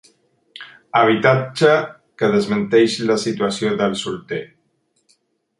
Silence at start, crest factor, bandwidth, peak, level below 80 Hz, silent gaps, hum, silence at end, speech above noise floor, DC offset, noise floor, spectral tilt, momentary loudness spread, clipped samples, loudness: 0.6 s; 18 dB; 11.5 kHz; -2 dBFS; -60 dBFS; none; none; 1.15 s; 49 dB; under 0.1%; -66 dBFS; -5.5 dB/octave; 13 LU; under 0.1%; -18 LUFS